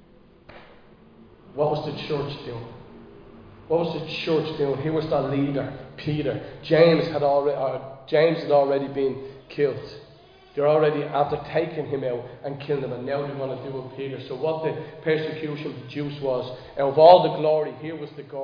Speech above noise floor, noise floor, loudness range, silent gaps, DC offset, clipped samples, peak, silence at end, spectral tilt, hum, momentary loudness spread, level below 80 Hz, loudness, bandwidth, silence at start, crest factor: 28 dB; -51 dBFS; 8 LU; none; under 0.1%; under 0.1%; -2 dBFS; 0 s; -8.5 dB/octave; none; 16 LU; -56 dBFS; -24 LUFS; 5.2 kHz; 0.5 s; 22 dB